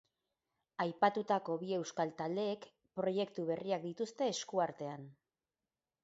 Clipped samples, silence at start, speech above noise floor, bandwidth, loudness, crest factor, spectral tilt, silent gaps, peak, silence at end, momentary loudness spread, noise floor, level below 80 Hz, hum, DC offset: under 0.1%; 0.8 s; over 53 dB; 7.6 kHz; -38 LUFS; 24 dB; -4 dB/octave; none; -16 dBFS; 0.9 s; 13 LU; under -90 dBFS; -84 dBFS; none; under 0.1%